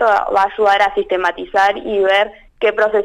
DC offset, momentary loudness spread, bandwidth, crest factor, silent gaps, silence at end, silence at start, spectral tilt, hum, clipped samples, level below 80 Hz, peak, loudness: under 0.1%; 5 LU; 12 kHz; 10 dB; none; 0 s; 0 s; -3.5 dB/octave; none; under 0.1%; -48 dBFS; -4 dBFS; -15 LUFS